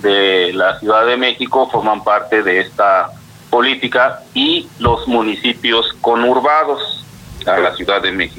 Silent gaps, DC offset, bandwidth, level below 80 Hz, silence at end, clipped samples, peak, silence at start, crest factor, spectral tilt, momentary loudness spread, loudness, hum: none; under 0.1%; 17 kHz; -42 dBFS; 0 s; under 0.1%; -2 dBFS; 0 s; 12 dB; -5 dB/octave; 4 LU; -14 LUFS; none